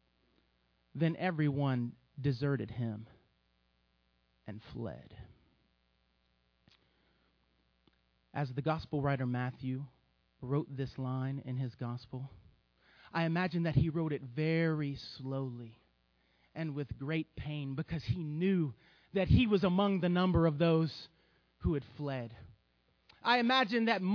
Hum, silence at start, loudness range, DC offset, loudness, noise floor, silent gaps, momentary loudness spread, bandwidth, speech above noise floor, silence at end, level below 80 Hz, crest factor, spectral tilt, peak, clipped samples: none; 0.95 s; 18 LU; under 0.1%; -34 LUFS; -75 dBFS; none; 18 LU; 5.4 kHz; 42 dB; 0 s; -54 dBFS; 22 dB; -8.5 dB/octave; -14 dBFS; under 0.1%